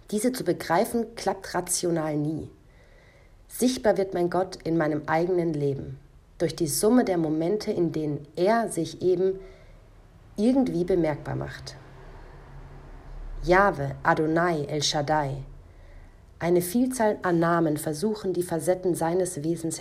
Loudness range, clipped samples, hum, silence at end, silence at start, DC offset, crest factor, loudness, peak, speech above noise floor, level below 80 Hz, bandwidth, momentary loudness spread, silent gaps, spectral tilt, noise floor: 3 LU; under 0.1%; none; 0 s; 0.1 s; under 0.1%; 20 dB; -26 LUFS; -6 dBFS; 28 dB; -48 dBFS; 16 kHz; 12 LU; none; -5 dB/octave; -53 dBFS